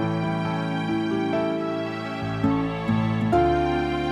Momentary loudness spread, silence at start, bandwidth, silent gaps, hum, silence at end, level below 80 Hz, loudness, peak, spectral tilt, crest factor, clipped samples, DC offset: 7 LU; 0 s; 11 kHz; none; none; 0 s; -42 dBFS; -24 LUFS; -8 dBFS; -7.5 dB/octave; 16 dB; under 0.1%; under 0.1%